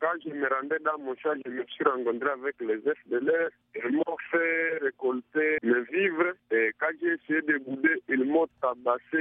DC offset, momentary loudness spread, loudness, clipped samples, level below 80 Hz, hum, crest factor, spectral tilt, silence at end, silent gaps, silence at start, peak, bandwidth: under 0.1%; 6 LU; -28 LUFS; under 0.1%; -78 dBFS; none; 20 dB; -3 dB/octave; 0 s; none; 0 s; -10 dBFS; 3.8 kHz